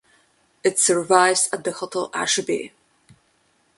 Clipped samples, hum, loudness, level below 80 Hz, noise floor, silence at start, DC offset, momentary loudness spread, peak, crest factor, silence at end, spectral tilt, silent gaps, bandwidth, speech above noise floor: under 0.1%; none; -20 LUFS; -68 dBFS; -64 dBFS; 0.65 s; under 0.1%; 11 LU; 0 dBFS; 22 dB; 1.1 s; -1.5 dB/octave; none; 12 kHz; 43 dB